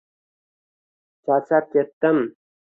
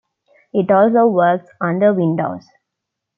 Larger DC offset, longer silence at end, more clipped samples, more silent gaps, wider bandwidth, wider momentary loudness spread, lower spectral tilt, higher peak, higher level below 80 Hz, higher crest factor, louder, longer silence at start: neither; second, 0.5 s vs 0.8 s; neither; first, 1.93-2.01 s vs none; second, 3.9 kHz vs 5.8 kHz; about the same, 9 LU vs 10 LU; about the same, -9.5 dB/octave vs -10.5 dB/octave; about the same, -4 dBFS vs -2 dBFS; second, -72 dBFS vs -66 dBFS; first, 20 dB vs 14 dB; second, -21 LUFS vs -16 LUFS; first, 1.25 s vs 0.55 s